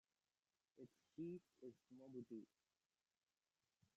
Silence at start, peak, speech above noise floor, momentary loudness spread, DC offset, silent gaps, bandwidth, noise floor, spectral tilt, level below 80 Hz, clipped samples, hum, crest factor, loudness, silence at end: 0.75 s; -44 dBFS; over 33 dB; 13 LU; under 0.1%; none; 7.6 kHz; under -90 dBFS; -9.5 dB/octave; under -90 dBFS; under 0.1%; none; 18 dB; -59 LUFS; 1.5 s